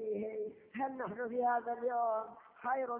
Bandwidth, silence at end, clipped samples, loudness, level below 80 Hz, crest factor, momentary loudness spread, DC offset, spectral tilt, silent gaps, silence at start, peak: 3.4 kHz; 0 s; under 0.1%; -37 LUFS; -80 dBFS; 14 dB; 10 LU; under 0.1%; -5.5 dB/octave; none; 0 s; -24 dBFS